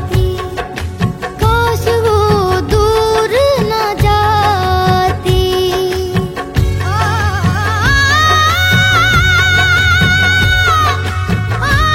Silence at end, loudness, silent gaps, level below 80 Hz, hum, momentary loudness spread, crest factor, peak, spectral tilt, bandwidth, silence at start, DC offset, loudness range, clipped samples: 0 s; -12 LUFS; none; -24 dBFS; none; 8 LU; 12 dB; 0 dBFS; -4.5 dB/octave; 16.5 kHz; 0 s; under 0.1%; 4 LU; under 0.1%